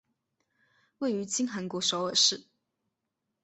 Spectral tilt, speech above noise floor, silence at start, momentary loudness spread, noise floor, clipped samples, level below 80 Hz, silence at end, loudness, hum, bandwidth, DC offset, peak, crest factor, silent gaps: -2 dB/octave; 55 dB; 1 s; 10 LU; -84 dBFS; under 0.1%; -78 dBFS; 1 s; -28 LUFS; none; 8.4 kHz; under 0.1%; -12 dBFS; 22 dB; none